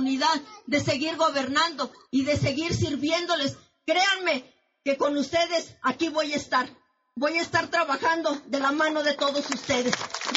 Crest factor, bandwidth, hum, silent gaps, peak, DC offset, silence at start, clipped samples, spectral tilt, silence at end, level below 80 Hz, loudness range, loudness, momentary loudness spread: 24 dB; 8 kHz; none; none; -2 dBFS; under 0.1%; 0 s; under 0.1%; -2.5 dB/octave; 0 s; -56 dBFS; 1 LU; -25 LUFS; 6 LU